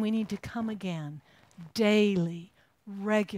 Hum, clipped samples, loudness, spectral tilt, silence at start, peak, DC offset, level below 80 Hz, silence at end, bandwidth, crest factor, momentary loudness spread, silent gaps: none; under 0.1%; -30 LUFS; -6 dB/octave; 0 s; -14 dBFS; under 0.1%; -64 dBFS; 0 s; 15.5 kHz; 16 dB; 20 LU; none